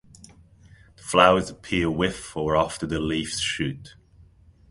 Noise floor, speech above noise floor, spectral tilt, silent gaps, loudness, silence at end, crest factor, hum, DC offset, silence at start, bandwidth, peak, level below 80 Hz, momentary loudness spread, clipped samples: -53 dBFS; 30 dB; -4.5 dB/octave; none; -23 LUFS; 0.8 s; 24 dB; none; under 0.1%; 1.05 s; 11.5 kHz; 0 dBFS; -46 dBFS; 12 LU; under 0.1%